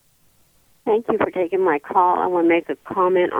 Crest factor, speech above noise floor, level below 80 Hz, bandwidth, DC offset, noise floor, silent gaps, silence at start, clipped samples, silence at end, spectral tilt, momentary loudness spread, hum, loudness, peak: 16 dB; 39 dB; -62 dBFS; 3.8 kHz; under 0.1%; -58 dBFS; none; 0.85 s; under 0.1%; 0 s; -7.5 dB/octave; 5 LU; none; -20 LUFS; -4 dBFS